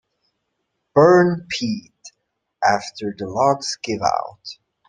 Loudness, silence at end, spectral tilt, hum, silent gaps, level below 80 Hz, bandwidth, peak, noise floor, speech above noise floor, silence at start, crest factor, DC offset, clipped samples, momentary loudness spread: -19 LUFS; 0.35 s; -5 dB/octave; none; none; -60 dBFS; 9.6 kHz; -2 dBFS; -75 dBFS; 56 dB; 0.95 s; 20 dB; under 0.1%; under 0.1%; 17 LU